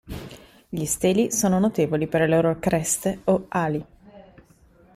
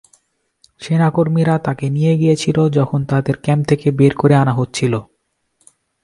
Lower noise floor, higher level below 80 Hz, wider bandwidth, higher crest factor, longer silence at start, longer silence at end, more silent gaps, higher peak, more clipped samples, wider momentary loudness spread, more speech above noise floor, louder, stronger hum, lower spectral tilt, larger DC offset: second, -55 dBFS vs -65 dBFS; about the same, -50 dBFS vs -50 dBFS; first, 15.5 kHz vs 11.5 kHz; about the same, 16 dB vs 16 dB; second, 0.05 s vs 0.8 s; second, 0.75 s vs 1 s; neither; second, -8 dBFS vs 0 dBFS; neither; first, 13 LU vs 6 LU; second, 33 dB vs 50 dB; second, -22 LUFS vs -16 LUFS; neither; second, -5 dB/octave vs -7.5 dB/octave; neither